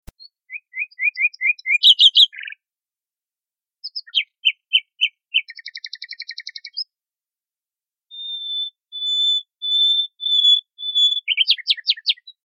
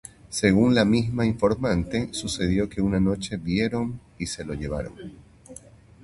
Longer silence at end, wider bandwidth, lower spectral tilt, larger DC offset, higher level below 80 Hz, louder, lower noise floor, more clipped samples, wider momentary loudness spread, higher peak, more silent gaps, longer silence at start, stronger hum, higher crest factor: second, 0.15 s vs 0.45 s; about the same, 12.5 kHz vs 11.5 kHz; second, 4 dB/octave vs -5.5 dB/octave; neither; second, -62 dBFS vs -42 dBFS; first, -16 LUFS vs -24 LUFS; first, under -90 dBFS vs -48 dBFS; neither; about the same, 20 LU vs 21 LU; first, 0 dBFS vs -4 dBFS; neither; first, 0.5 s vs 0.3 s; neither; about the same, 20 dB vs 22 dB